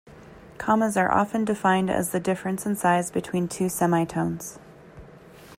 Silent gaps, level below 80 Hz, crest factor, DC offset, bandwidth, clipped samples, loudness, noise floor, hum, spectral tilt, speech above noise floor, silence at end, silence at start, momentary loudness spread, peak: none; -56 dBFS; 18 dB; under 0.1%; 16 kHz; under 0.1%; -24 LUFS; -47 dBFS; none; -5.5 dB/octave; 23 dB; 0.05 s; 0.05 s; 7 LU; -8 dBFS